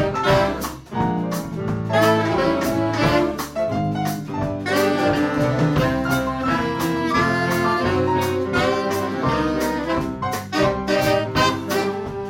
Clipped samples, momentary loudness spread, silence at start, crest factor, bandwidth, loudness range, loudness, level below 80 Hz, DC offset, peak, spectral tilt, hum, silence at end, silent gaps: under 0.1%; 7 LU; 0 s; 16 dB; 16.5 kHz; 1 LU; -21 LUFS; -40 dBFS; under 0.1%; -4 dBFS; -5.5 dB/octave; none; 0 s; none